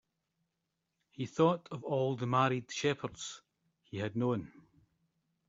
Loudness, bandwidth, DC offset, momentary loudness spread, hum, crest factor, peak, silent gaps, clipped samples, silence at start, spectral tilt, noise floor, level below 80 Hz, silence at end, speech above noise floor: -34 LUFS; 7.8 kHz; under 0.1%; 14 LU; none; 22 dB; -14 dBFS; none; under 0.1%; 1.2 s; -5.5 dB/octave; -85 dBFS; -72 dBFS; 1 s; 52 dB